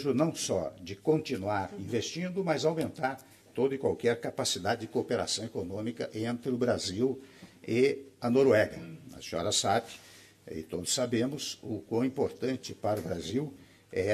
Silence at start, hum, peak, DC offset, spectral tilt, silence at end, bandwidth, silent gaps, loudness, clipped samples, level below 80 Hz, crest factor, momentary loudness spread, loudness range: 0 s; none; -12 dBFS; under 0.1%; -4.5 dB/octave; 0 s; 14.5 kHz; none; -31 LUFS; under 0.1%; -68 dBFS; 18 dB; 11 LU; 3 LU